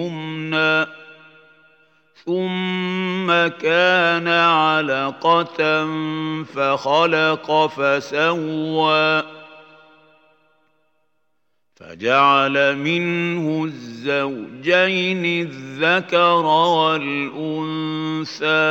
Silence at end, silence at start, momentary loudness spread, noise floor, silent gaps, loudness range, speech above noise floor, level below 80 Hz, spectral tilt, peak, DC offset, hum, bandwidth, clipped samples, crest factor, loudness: 0 s; 0 s; 10 LU; -74 dBFS; none; 5 LU; 56 dB; -76 dBFS; -5.5 dB/octave; -2 dBFS; under 0.1%; none; 16 kHz; under 0.1%; 18 dB; -18 LUFS